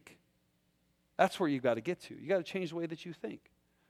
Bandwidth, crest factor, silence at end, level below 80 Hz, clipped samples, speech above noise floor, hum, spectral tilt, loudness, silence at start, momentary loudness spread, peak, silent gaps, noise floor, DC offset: 15 kHz; 24 dB; 0.55 s; -78 dBFS; under 0.1%; 40 dB; none; -6 dB/octave; -35 LUFS; 0.05 s; 14 LU; -12 dBFS; none; -75 dBFS; under 0.1%